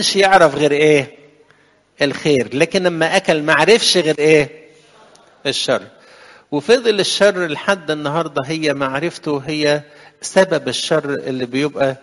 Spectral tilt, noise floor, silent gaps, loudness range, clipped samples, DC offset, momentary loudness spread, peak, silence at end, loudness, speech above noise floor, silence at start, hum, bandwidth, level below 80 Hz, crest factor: -4 dB/octave; -54 dBFS; none; 4 LU; under 0.1%; under 0.1%; 10 LU; 0 dBFS; 0.05 s; -16 LUFS; 38 dB; 0 s; none; 11.5 kHz; -56 dBFS; 16 dB